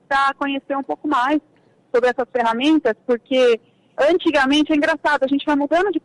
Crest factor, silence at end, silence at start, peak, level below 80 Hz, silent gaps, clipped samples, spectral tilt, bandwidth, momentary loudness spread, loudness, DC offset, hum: 10 dB; 0.05 s; 0.1 s; -8 dBFS; -56 dBFS; none; under 0.1%; -3.5 dB/octave; 11 kHz; 8 LU; -19 LUFS; under 0.1%; none